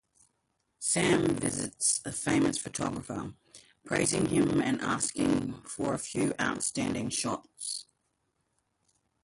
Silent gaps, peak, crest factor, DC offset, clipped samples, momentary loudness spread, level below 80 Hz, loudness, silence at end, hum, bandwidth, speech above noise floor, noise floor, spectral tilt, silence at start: none; -14 dBFS; 18 dB; under 0.1%; under 0.1%; 10 LU; -58 dBFS; -30 LUFS; 1.4 s; none; 11.5 kHz; 48 dB; -78 dBFS; -4 dB/octave; 0.8 s